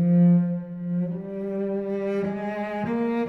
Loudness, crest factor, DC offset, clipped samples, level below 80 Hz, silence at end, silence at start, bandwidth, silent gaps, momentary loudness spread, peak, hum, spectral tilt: -25 LUFS; 12 dB; under 0.1%; under 0.1%; -62 dBFS; 0 s; 0 s; 4 kHz; none; 11 LU; -10 dBFS; none; -10.5 dB/octave